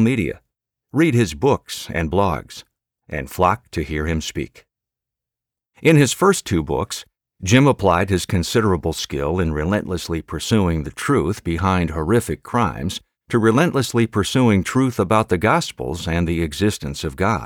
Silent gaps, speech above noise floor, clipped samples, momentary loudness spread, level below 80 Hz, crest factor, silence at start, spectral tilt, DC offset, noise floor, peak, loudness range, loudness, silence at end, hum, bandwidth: none; 68 dB; under 0.1%; 11 LU; -38 dBFS; 16 dB; 0 s; -5.5 dB/octave; under 0.1%; -87 dBFS; -2 dBFS; 4 LU; -19 LUFS; 0 s; none; 18.5 kHz